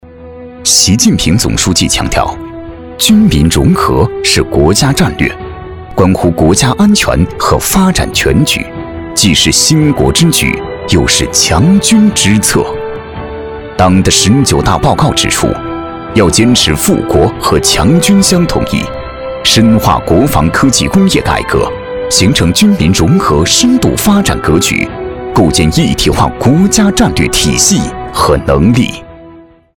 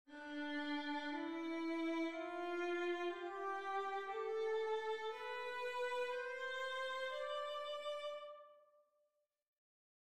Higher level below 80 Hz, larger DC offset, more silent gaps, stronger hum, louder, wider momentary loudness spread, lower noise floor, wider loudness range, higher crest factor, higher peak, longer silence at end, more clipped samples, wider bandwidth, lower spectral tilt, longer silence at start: first, -24 dBFS vs -86 dBFS; neither; second, none vs 9.48-9.53 s; neither; first, -8 LUFS vs -43 LUFS; first, 11 LU vs 5 LU; second, -36 dBFS vs -84 dBFS; second, 1 LU vs 4 LU; about the same, 10 dB vs 14 dB; first, 0 dBFS vs -30 dBFS; about the same, 0.4 s vs 0.45 s; first, 0.5% vs under 0.1%; first, over 20 kHz vs 13.5 kHz; first, -4 dB/octave vs -2.5 dB/octave; about the same, 0.05 s vs 0.05 s